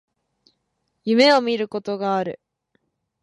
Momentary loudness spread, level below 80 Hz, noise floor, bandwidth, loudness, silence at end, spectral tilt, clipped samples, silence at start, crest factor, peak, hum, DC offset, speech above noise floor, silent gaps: 17 LU; -72 dBFS; -74 dBFS; 11 kHz; -20 LUFS; 0.85 s; -4.5 dB/octave; under 0.1%; 1.05 s; 20 dB; -4 dBFS; none; under 0.1%; 55 dB; none